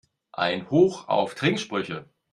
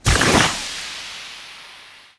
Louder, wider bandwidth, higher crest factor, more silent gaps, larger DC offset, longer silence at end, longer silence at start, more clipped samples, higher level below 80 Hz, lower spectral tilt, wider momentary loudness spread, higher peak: second, -25 LUFS vs -18 LUFS; about the same, 11.5 kHz vs 11 kHz; about the same, 20 dB vs 22 dB; neither; neither; about the same, 0.3 s vs 0.3 s; first, 0.35 s vs 0.05 s; neither; second, -66 dBFS vs -32 dBFS; first, -5.5 dB/octave vs -3 dB/octave; second, 14 LU vs 24 LU; second, -6 dBFS vs 0 dBFS